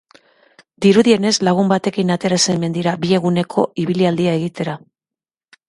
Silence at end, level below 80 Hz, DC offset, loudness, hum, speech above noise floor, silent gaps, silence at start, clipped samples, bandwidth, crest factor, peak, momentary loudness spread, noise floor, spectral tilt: 0.9 s; -58 dBFS; under 0.1%; -16 LUFS; none; 73 dB; none; 0.8 s; under 0.1%; 11.5 kHz; 16 dB; 0 dBFS; 8 LU; -89 dBFS; -5 dB/octave